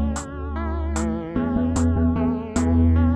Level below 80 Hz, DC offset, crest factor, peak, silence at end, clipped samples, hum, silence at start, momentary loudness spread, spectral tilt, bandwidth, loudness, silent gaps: -30 dBFS; under 0.1%; 12 dB; -8 dBFS; 0 s; under 0.1%; none; 0 s; 9 LU; -7.5 dB/octave; 10 kHz; -23 LUFS; none